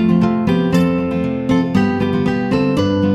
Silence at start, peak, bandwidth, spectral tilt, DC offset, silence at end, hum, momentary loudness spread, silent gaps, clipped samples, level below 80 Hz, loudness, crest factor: 0 s; -2 dBFS; 12.5 kHz; -8 dB/octave; under 0.1%; 0 s; none; 3 LU; none; under 0.1%; -42 dBFS; -16 LUFS; 12 dB